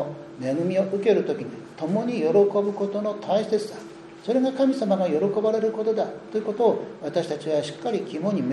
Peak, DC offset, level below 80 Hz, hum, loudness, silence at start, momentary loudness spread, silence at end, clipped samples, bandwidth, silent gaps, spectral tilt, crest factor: -8 dBFS; under 0.1%; -70 dBFS; none; -24 LUFS; 0 s; 10 LU; 0 s; under 0.1%; 11 kHz; none; -7 dB/octave; 16 dB